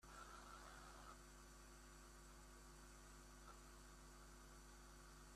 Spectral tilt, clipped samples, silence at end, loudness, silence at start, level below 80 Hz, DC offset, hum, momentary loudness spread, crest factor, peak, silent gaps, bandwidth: -3.5 dB/octave; under 0.1%; 0 s; -62 LUFS; 0 s; -66 dBFS; under 0.1%; none; 4 LU; 14 dB; -48 dBFS; none; 15 kHz